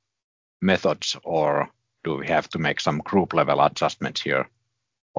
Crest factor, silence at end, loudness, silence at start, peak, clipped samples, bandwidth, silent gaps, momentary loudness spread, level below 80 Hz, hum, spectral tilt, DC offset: 20 dB; 0 s; -23 LUFS; 0.6 s; -4 dBFS; under 0.1%; 7.6 kHz; 5.01-5.14 s; 9 LU; -56 dBFS; none; -5 dB/octave; under 0.1%